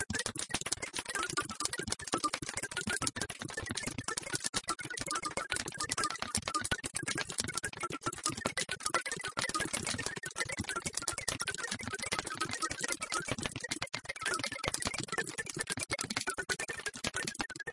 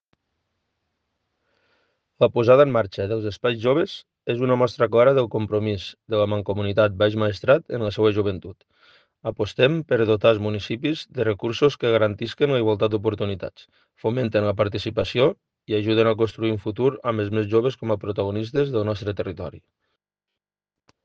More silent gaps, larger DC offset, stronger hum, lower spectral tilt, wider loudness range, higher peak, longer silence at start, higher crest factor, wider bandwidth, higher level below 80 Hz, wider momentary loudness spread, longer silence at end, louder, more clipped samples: first, 4.49-4.53 s vs none; neither; neither; second, -1.5 dB/octave vs -7.5 dB/octave; about the same, 1 LU vs 3 LU; second, -8 dBFS vs -4 dBFS; second, 0 s vs 2.2 s; first, 30 dB vs 20 dB; first, 11.5 kHz vs 7.4 kHz; about the same, -60 dBFS vs -60 dBFS; second, 4 LU vs 10 LU; second, 0 s vs 1.45 s; second, -36 LUFS vs -22 LUFS; neither